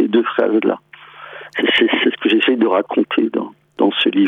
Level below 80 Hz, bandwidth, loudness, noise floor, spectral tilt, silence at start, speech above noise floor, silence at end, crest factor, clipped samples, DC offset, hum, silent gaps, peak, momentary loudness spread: -66 dBFS; 4.5 kHz; -16 LUFS; -37 dBFS; -6 dB/octave; 0 s; 22 dB; 0 s; 14 dB; under 0.1%; under 0.1%; none; none; -2 dBFS; 14 LU